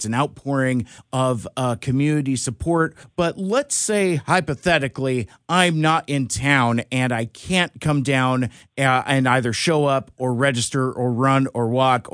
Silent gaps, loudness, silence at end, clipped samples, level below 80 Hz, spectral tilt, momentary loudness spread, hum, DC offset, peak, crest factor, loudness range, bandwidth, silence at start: none; -20 LUFS; 0.05 s; under 0.1%; -50 dBFS; -5 dB/octave; 6 LU; none; under 0.1%; -2 dBFS; 18 dB; 2 LU; 10.5 kHz; 0 s